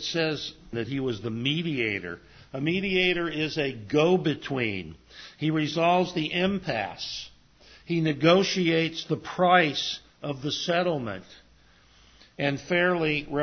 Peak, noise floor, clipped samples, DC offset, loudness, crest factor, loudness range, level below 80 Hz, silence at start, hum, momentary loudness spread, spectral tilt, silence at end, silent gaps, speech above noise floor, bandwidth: -6 dBFS; -58 dBFS; under 0.1%; under 0.1%; -26 LUFS; 22 dB; 4 LU; -58 dBFS; 0 s; none; 14 LU; -5.5 dB/octave; 0 s; none; 31 dB; 6.6 kHz